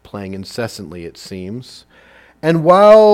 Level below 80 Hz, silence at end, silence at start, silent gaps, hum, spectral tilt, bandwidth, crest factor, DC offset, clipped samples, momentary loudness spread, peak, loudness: -52 dBFS; 0 s; 0.15 s; none; none; -6.5 dB/octave; 13.5 kHz; 14 dB; under 0.1%; 0.1%; 23 LU; 0 dBFS; -12 LUFS